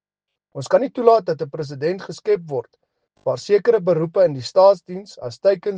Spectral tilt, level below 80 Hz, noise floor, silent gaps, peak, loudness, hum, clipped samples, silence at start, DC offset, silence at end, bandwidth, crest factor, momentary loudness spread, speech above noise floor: -6 dB/octave; -68 dBFS; -83 dBFS; none; 0 dBFS; -19 LUFS; none; under 0.1%; 0.55 s; under 0.1%; 0 s; 9.2 kHz; 18 dB; 14 LU; 65 dB